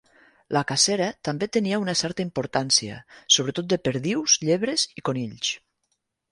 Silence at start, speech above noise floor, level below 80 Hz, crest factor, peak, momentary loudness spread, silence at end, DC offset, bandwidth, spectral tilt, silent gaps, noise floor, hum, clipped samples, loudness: 0.5 s; 51 dB; -62 dBFS; 22 dB; -4 dBFS; 9 LU; 0.75 s; under 0.1%; 11.5 kHz; -3 dB/octave; none; -76 dBFS; none; under 0.1%; -23 LUFS